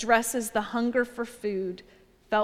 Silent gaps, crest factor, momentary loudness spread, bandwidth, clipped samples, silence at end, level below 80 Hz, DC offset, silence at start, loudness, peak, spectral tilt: none; 20 dB; 10 LU; 16 kHz; under 0.1%; 0 s; -58 dBFS; under 0.1%; 0 s; -28 LUFS; -8 dBFS; -3.5 dB/octave